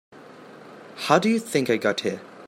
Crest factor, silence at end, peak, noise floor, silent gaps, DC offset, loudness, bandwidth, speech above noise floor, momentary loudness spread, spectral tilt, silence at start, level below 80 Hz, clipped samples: 22 dB; 0 s; -2 dBFS; -45 dBFS; none; under 0.1%; -23 LUFS; 15.5 kHz; 23 dB; 23 LU; -4.5 dB/octave; 0.15 s; -72 dBFS; under 0.1%